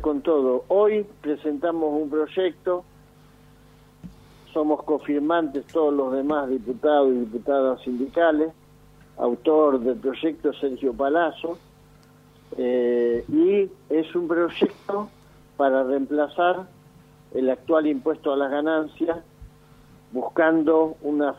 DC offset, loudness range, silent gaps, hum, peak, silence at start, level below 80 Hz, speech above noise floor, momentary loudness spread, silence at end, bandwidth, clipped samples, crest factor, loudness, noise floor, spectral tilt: under 0.1%; 4 LU; none; 50 Hz at -60 dBFS; -6 dBFS; 0 s; -58 dBFS; 30 dB; 9 LU; 0.05 s; 6.2 kHz; under 0.1%; 16 dB; -23 LUFS; -52 dBFS; -7 dB/octave